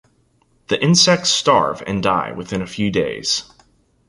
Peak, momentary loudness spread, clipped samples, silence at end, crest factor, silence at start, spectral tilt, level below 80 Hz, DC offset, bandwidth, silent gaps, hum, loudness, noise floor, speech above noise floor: -2 dBFS; 11 LU; under 0.1%; 0.65 s; 18 dB; 0.7 s; -3.5 dB/octave; -50 dBFS; under 0.1%; 11.5 kHz; none; none; -17 LUFS; -60 dBFS; 42 dB